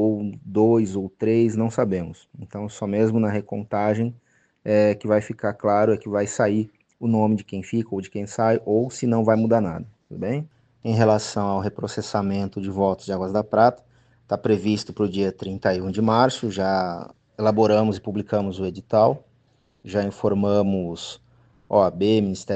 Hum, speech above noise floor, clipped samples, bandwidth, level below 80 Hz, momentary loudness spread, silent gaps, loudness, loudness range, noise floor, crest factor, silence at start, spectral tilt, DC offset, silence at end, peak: none; 41 dB; under 0.1%; 8.8 kHz; -58 dBFS; 11 LU; none; -22 LUFS; 2 LU; -62 dBFS; 20 dB; 0 s; -7 dB/octave; under 0.1%; 0 s; -2 dBFS